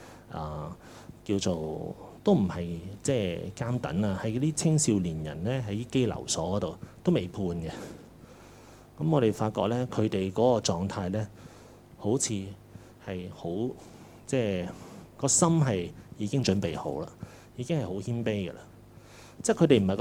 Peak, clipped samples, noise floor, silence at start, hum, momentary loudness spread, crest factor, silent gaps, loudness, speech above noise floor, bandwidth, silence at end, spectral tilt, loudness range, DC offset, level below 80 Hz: -8 dBFS; under 0.1%; -51 dBFS; 0 s; none; 18 LU; 22 dB; none; -29 LUFS; 23 dB; 15.5 kHz; 0 s; -5.5 dB/octave; 5 LU; under 0.1%; -56 dBFS